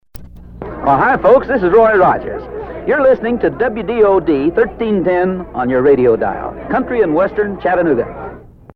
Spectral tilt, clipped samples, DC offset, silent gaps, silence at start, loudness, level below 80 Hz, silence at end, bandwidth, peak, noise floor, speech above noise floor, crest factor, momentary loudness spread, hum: -9 dB/octave; under 0.1%; under 0.1%; none; 0.15 s; -13 LUFS; -38 dBFS; 0.3 s; 16 kHz; 0 dBFS; -33 dBFS; 20 dB; 14 dB; 14 LU; none